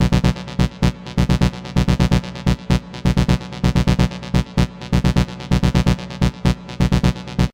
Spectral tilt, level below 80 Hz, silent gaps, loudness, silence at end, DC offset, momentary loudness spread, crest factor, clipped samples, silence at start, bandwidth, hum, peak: -6.5 dB/octave; -24 dBFS; none; -19 LUFS; 0.05 s; under 0.1%; 5 LU; 16 dB; under 0.1%; 0 s; 16 kHz; none; -2 dBFS